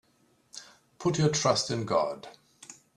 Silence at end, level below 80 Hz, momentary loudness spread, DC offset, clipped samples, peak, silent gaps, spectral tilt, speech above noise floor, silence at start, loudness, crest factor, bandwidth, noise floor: 0.25 s; -64 dBFS; 23 LU; under 0.1%; under 0.1%; -10 dBFS; none; -4.5 dB/octave; 40 dB; 0.55 s; -28 LUFS; 22 dB; 12 kHz; -67 dBFS